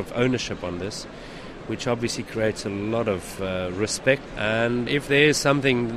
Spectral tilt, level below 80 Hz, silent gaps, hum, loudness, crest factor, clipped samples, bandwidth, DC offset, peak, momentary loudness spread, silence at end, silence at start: -4.5 dB/octave; -46 dBFS; none; none; -24 LUFS; 20 dB; under 0.1%; 15 kHz; under 0.1%; -4 dBFS; 15 LU; 0 s; 0 s